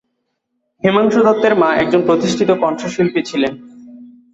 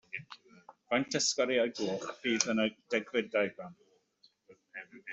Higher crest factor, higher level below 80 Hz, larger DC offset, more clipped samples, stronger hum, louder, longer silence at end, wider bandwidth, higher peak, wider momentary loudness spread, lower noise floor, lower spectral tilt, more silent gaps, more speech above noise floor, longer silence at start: second, 14 dB vs 28 dB; first, -54 dBFS vs -78 dBFS; neither; neither; neither; first, -15 LUFS vs -32 LUFS; first, 0.25 s vs 0 s; about the same, 8 kHz vs 8.2 kHz; first, -2 dBFS vs -8 dBFS; second, 7 LU vs 20 LU; about the same, -71 dBFS vs -69 dBFS; first, -5.5 dB/octave vs -2.5 dB/octave; neither; first, 57 dB vs 37 dB; first, 0.85 s vs 0.15 s